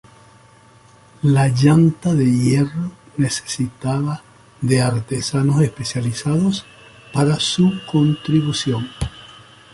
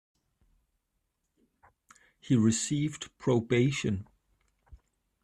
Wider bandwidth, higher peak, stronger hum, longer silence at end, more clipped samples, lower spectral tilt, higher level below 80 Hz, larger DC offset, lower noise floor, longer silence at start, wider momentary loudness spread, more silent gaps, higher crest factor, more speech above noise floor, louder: second, 11.5 kHz vs 13 kHz; first, -2 dBFS vs -14 dBFS; neither; about the same, 0.4 s vs 0.5 s; neither; about the same, -6 dB/octave vs -5.5 dB/octave; first, -44 dBFS vs -62 dBFS; neither; second, -48 dBFS vs -80 dBFS; second, 1.25 s vs 2.25 s; about the same, 11 LU vs 9 LU; neither; about the same, 16 dB vs 18 dB; second, 31 dB vs 52 dB; first, -18 LUFS vs -29 LUFS